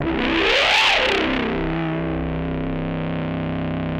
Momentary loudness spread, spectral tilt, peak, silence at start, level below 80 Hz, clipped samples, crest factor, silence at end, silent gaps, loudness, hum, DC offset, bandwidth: 11 LU; -5 dB/octave; -4 dBFS; 0 s; -36 dBFS; under 0.1%; 16 dB; 0 s; none; -20 LUFS; none; under 0.1%; 11 kHz